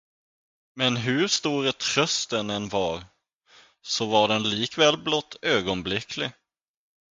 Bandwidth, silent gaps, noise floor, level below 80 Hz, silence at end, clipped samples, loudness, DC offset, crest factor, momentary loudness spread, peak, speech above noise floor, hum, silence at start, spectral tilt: 9.6 kHz; 3.35-3.41 s; -58 dBFS; -58 dBFS; 0.8 s; under 0.1%; -24 LUFS; under 0.1%; 22 dB; 9 LU; -6 dBFS; 33 dB; none; 0.75 s; -3 dB/octave